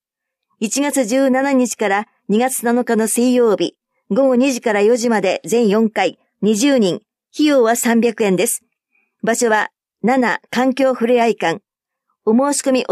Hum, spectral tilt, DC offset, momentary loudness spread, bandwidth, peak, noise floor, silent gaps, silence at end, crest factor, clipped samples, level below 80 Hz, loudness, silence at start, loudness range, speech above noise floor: none; -4 dB/octave; under 0.1%; 7 LU; 15.5 kHz; -4 dBFS; -80 dBFS; none; 0 s; 12 dB; under 0.1%; -70 dBFS; -16 LUFS; 0.6 s; 2 LU; 65 dB